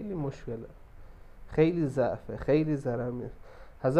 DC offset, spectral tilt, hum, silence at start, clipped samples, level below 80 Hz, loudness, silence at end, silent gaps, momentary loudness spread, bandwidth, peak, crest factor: under 0.1%; -9 dB/octave; none; 0 s; under 0.1%; -50 dBFS; -30 LUFS; 0 s; none; 15 LU; 10.5 kHz; -10 dBFS; 20 dB